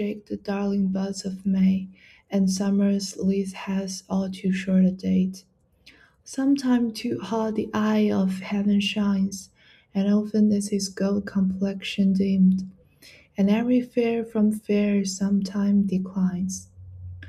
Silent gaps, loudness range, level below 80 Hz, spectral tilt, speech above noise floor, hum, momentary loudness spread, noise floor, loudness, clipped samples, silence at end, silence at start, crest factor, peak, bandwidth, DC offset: none; 2 LU; -60 dBFS; -6.5 dB/octave; 33 dB; none; 8 LU; -56 dBFS; -24 LUFS; under 0.1%; 0 s; 0 s; 14 dB; -10 dBFS; 12 kHz; under 0.1%